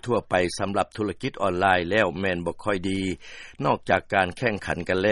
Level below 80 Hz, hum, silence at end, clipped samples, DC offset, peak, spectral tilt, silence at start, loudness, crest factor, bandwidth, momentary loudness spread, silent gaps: -52 dBFS; none; 0 s; under 0.1%; under 0.1%; -4 dBFS; -5.5 dB/octave; 0.05 s; -25 LUFS; 20 dB; 11.5 kHz; 8 LU; none